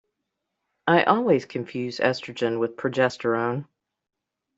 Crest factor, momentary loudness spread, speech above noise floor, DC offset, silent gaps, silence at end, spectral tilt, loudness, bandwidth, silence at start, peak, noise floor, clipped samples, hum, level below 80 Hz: 22 dB; 11 LU; 58 dB; under 0.1%; none; 0.95 s; -6 dB/octave; -24 LUFS; 8 kHz; 0.85 s; -4 dBFS; -81 dBFS; under 0.1%; none; -68 dBFS